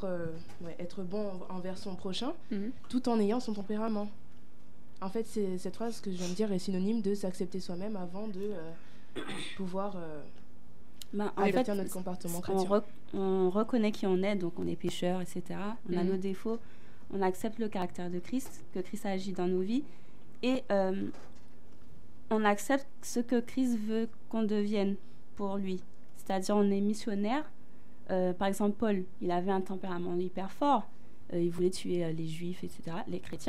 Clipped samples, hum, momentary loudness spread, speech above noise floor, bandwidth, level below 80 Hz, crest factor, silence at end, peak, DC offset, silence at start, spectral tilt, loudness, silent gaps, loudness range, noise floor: under 0.1%; none; 12 LU; 26 dB; 15 kHz; -66 dBFS; 20 dB; 0 s; -14 dBFS; 2%; 0 s; -6 dB/octave; -34 LUFS; none; 5 LU; -59 dBFS